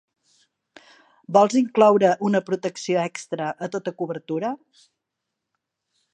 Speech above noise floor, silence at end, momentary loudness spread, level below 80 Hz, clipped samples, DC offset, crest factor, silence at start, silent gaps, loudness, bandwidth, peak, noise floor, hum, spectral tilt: 61 dB; 1.6 s; 13 LU; -76 dBFS; under 0.1%; under 0.1%; 22 dB; 1.3 s; none; -22 LUFS; 9.4 kHz; -2 dBFS; -82 dBFS; none; -5.5 dB/octave